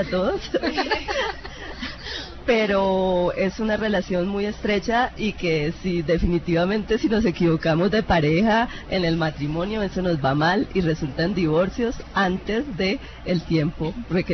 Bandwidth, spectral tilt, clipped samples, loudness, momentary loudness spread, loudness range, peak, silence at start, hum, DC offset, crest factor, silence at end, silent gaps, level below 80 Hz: 6.4 kHz; -6.5 dB/octave; under 0.1%; -23 LUFS; 7 LU; 3 LU; -6 dBFS; 0 s; none; under 0.1%; 16 dB; 0 s; none; -38 dBFS